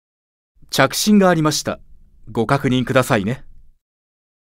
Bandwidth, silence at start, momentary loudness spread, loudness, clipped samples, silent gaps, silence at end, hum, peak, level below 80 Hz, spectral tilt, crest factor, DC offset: 16.5 kHz; 0.7 s; 14 LU; -17 LUFS; under 0.1%; none; 1.05 s; none; 0 dBFS; -46 dBFS; -5 dB/octave; 20 dB; under 0.1%